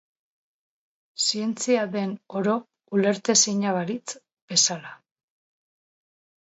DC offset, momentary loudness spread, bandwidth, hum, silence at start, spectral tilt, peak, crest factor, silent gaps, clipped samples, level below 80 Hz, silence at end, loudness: under 0.1%; 17 LU; 8.2 kHz; none; 1.2 s; -2.5 dB/octave; -4 dBFS; 22 dB; 4.33-4.48 s; under 0.1%; -78 dBFS; 1.55 s; -23 LUFS